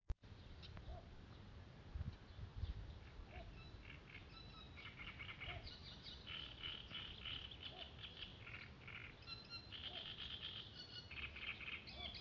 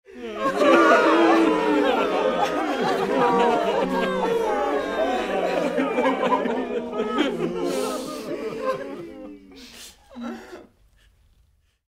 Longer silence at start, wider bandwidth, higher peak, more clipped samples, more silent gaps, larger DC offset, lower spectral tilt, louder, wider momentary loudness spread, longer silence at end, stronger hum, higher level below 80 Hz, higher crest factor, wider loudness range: about the same, 0.05 s vs 0.1 s; second, 7.2 kHz vs 16 kHz; second, -34 dBFS vs -2 dBFS; neither; neither; neither; second, -2 dB/octave vs -5 dB/octave; second, -52 LUFS vs -22 LUFS; second, 9 LU vs 20 LU; second, 0 s vs 1.25 s; neither; about the same, -60 dBFS vs -56 dBFS; about the same, 20 dB vs 20 dB; second, 5 LU vs 14 LU